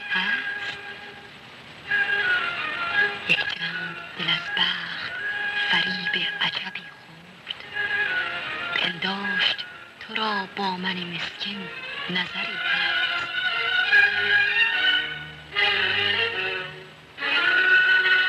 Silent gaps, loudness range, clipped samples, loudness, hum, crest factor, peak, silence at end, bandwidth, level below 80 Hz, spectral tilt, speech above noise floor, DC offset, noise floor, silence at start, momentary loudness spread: none; 6 LU; under 0.1%; -23 LUFS; none; 18 dB; -6 dBFS; 0 s; 13 kHz; -66 dBFS; -3 dB/octave; 18 dB; under 0.1%; -46 dBFS; 0 s; 17 LU